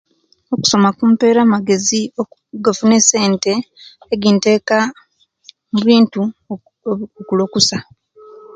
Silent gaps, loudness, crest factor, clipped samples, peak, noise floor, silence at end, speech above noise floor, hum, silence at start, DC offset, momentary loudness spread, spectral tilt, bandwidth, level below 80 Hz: none; -14 LUFS; 16 dB; under 0.1%; 0 dBFS; -47 dBFS; 0.15 s; 32 dB; none; 0.5 s; under 0.1%; 13 LU; -4 dB/octave; 9.2 kHz; -58 dBFS